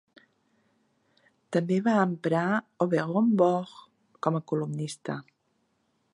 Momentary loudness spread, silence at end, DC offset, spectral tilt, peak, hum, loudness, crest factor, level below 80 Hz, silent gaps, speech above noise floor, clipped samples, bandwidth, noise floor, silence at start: 11 LU; 0.95 s; under 0.1%; -7 dB/octave; -10 dBFS; none; -27 LUFS; 20 dB; -78 dBFS; none; 47 dB; under 0.1%; 11.5 kHz; -73 dBFS; 1.5 s